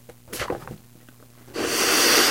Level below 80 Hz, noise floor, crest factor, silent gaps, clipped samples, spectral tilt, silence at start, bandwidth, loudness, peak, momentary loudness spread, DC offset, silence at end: -54 dBFS; -50 dBFS; 18 dB; none; under 0.1%; -1 dB/octave; 0.3 s; 16 kHz; -20 LUFS; -6 dBFS; 21 LU; 0.2%; 0 s